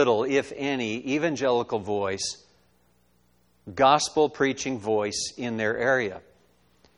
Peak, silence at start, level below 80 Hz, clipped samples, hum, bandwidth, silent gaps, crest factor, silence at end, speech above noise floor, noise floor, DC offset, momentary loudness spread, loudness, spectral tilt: -6 dBFS; 0 s; -62 dBFS; under 0.1%; 60 Hz at -60 dBFS; 11.5 kHz; none; 20 dB; 0.8 s; 40 dB; -65 dBFS; under 0.1%; 9 LU; -25 LUFS; -3.5 dB/octave